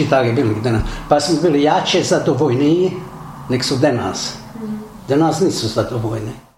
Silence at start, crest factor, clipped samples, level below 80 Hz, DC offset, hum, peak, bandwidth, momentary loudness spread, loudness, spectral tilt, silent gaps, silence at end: 0 s; 16 dB; under 0.1%; -38 dBFS; under 0.1%; none; 0 dBFS; 16 kHz; 14 LU; -17 LUFS; -5.5 dB/octave; none; 0.2 s